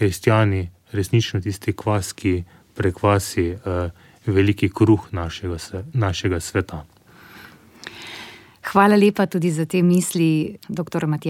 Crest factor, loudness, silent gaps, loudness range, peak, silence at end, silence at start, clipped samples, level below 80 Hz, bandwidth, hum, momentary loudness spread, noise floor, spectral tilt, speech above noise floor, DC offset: 20 dB; -21 LUFS; none; 6 LU; -2 dBFS; 0 s; 0 s; under 0.1%; -46 dBFS; 16 kHz; none; 16 LU; -45 dBFS; -6 dB/octave; 25 dB; under 0.1%